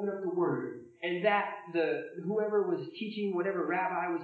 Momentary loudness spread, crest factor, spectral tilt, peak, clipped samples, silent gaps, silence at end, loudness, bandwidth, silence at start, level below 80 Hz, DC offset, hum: 7 LU; 18 dB; -8.5 dB/octave; -14 dBFS; under 0.1%; none; 0 s; -32 LUFS; 4.8 kHz; 0 s; under -90 dBFS; under 0.1%; none